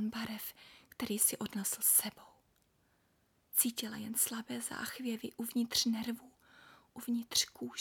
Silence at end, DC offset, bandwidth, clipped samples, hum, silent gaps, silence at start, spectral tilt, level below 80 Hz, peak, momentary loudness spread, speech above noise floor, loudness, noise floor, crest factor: 0 s; under 0.1%; 19.5 kHz; under 0.1%; none; none; 0 s; -1.5 dB/octave; -74 dBFS; -14 dBFS; 14 LU; 38 dB; -34 LUFS; -74 dBFS; 24 dB